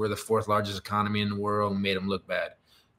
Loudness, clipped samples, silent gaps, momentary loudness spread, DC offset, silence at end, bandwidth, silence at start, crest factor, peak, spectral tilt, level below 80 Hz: -28 LUFS; under 0.1%; none; 5 LU; under 0.1%; 0.45 s; 16 kHz; 0 s; 16 dB; -12 dBFS; -5.5 dB/octave; -62 dBFS